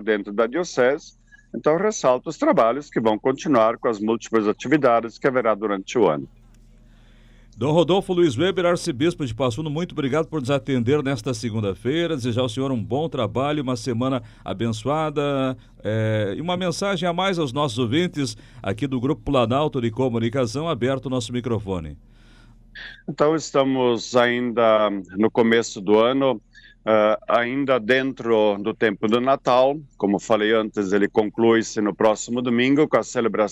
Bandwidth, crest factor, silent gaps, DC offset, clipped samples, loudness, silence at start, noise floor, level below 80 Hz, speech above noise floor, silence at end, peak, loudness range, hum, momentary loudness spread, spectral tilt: 12 kHz; 16 dB; none; under 0.1%; under 0.1%; -22 LUFS; 0 s; -50 dBFS; -50 dBFS; 29 dB; 0 s; -6 dBFS; 4 LU; none; 7 LU; -5.5 dB/octave